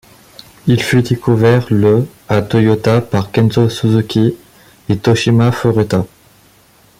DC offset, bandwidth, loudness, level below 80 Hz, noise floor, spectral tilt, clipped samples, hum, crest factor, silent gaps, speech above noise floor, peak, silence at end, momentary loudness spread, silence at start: under 0.1%; 15.5 kHz; -13 LUFS; -44 dBFS; -48 dBFS; -7 dB/octave; under 0.1%; none; 12 dB; none; 36 dB; 0 dBFS; 0.95 s; 6 LU; 0.65 s